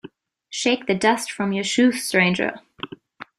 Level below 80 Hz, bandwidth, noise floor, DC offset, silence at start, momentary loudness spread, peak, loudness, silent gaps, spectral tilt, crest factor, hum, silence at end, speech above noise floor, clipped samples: -64 dBFS; 14.5 kHz; -45 dBFS; under 0.1%; 0.05 s; 18 LU; -2 dBFS; -20 LUFS; none; -4 dB/octave; 20 dB; none; 0.15 s; 25 dB; under 0.1%